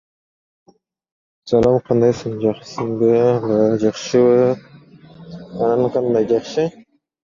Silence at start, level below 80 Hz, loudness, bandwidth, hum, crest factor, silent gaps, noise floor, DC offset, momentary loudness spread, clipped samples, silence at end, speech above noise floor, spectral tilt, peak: 1.45 s; -50 dBFS; -17 LUFS; 7.4 kHz; none; 16 dB; none; -44 dBFS; under 0.1%; 11 LU; under 0.1%; 0.6 s; 28 dB; -7 dB/octave; -2 dBFS